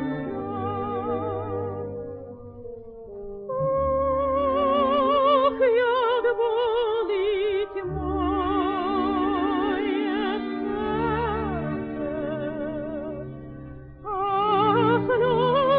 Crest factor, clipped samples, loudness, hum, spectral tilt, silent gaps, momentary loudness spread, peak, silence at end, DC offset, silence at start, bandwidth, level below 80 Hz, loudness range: 16 dB; under 0.1%; -24 LUFS; none; -10.5 dB/octave; none; 17 LU; -8 dBFS; 0 s; under 0.1%; 0 s; 4.9 kHz; -44 dBFS; 8 LU